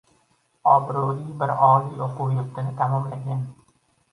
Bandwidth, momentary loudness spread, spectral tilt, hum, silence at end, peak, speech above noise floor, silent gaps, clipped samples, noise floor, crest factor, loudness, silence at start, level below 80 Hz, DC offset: 11 kHz; 12 LU; -9.5 dB/octave; none; 0.6 s; -2 dBFS; 43 dB; none; under 0.1%; -65 dBFS; 20 dB; -23 LUFS; 0.65 s; -64 dBFS; under 0.1%